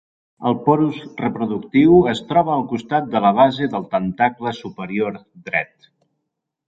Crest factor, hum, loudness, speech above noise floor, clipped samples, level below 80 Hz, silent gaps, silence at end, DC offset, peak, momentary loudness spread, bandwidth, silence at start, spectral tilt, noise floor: 16 dB; none; -19 LUFS; 60 dB; under 0.1%; -52 dBFS; none; 1.05 s; under 0.1%; -2 dBFS; 12 LU; 7.8 kHz; 0.4 s; -7.5 dB/octave; -78 dBFS